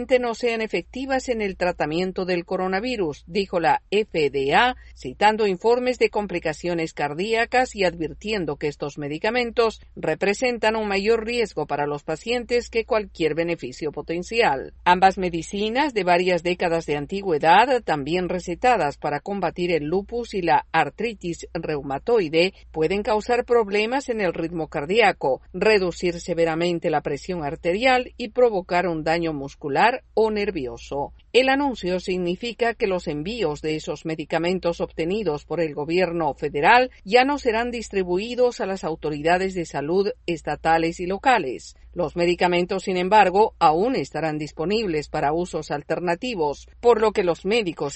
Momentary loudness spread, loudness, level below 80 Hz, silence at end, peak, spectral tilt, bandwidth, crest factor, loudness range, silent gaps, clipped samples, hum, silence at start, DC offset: 9 LU; -23 LUFS; -48 dBFS; 0 s; -2 dBFS; -5 dB/octave; 8.6 kHz; 20 dB; 4 LU; none; under 0.1%; none; 0 s; under 0.1%